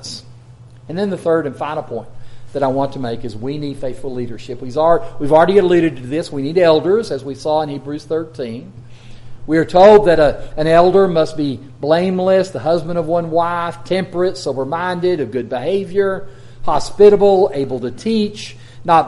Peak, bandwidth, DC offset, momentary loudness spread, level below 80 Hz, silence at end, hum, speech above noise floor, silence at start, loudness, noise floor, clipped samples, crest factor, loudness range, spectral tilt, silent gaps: 0 dBFS; 11.5 kHz; under 0.1%; 16 LU; -40 dBFS; 0 s; none; 25 dB; 0 s; -16 LUFS; -40 dBFS; under 0.1%; 16 dB; 8 LU; -6.5 dB/octave; none